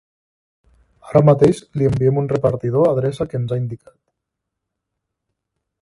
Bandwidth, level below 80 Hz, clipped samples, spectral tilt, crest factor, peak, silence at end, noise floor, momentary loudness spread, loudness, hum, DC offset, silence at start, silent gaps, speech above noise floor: 11.5 kHz; -48 dBFS; under 0.1%; -9 dB/octave; 20 dB; 0 dBFS; 2.05 s; -80 dBFS; 10 LU; -17 LUFS; none; under 0.1%; 1.05 s; none; 63 dB